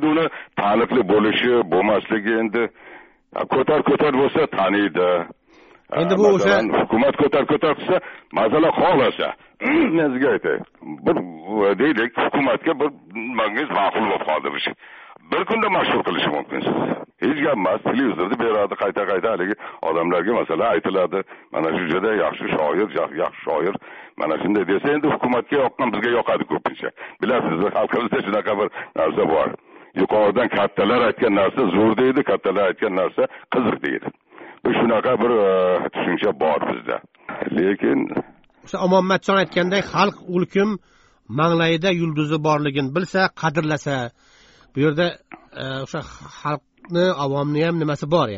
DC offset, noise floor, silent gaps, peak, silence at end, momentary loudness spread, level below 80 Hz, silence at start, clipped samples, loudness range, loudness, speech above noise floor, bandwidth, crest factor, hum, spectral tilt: under 0.1%; -51 dBFS; none; -4 dBFS; 0 s; 10 LU; -56 dBFS; 0 s; under 0.1%; 3 LU; -20 LUFS; 31 dB; 7.6 kHz; 16 dB; none; -4 dB/octave